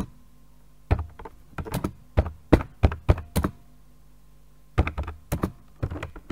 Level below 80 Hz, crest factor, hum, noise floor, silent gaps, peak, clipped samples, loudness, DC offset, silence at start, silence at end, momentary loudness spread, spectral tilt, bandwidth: -32 dBFS; 28 dB; none; -55 dBFS; none; 0 dBFS; under 0.1%; -28 LUFS; 0.3%; 0 s; 0.15 s; 15 LU; -7.5 dB/octave; 16 kHz